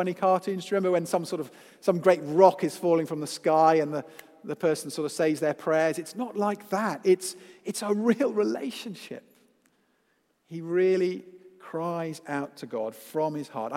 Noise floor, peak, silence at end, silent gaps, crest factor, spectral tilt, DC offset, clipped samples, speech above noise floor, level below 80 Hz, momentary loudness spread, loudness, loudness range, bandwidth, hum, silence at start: -71 dBFS; -4 dBFS; 0 s; none; 24 dB; -5.5 dB/octave; under 0.1%; under 0.1%; 44 dB; -82 dBFS; 16 LU; -27 LUFS; 7 LU; 16 kHz; none; 0 s